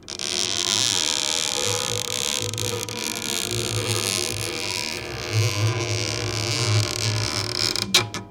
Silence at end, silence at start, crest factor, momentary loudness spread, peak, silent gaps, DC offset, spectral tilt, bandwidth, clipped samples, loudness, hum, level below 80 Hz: 0 s; 0 s; 24 dB; 7 LU; 0 dBFS; none; under 0.1%; -2.5 dB/octave; 17 kHz; under 0.1%; -22 LUFS; none; -50 dBFS